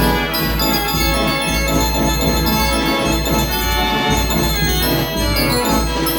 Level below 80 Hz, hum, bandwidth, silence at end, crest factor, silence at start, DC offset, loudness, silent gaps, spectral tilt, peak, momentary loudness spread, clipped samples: -24 dBFS; none; over 20 kHz; 0 s; 14 dB; 0 s; under 0.1%; -16 LUFS; none; -4 dB/octave; -2 dBFS; 1 LU; under 0.1%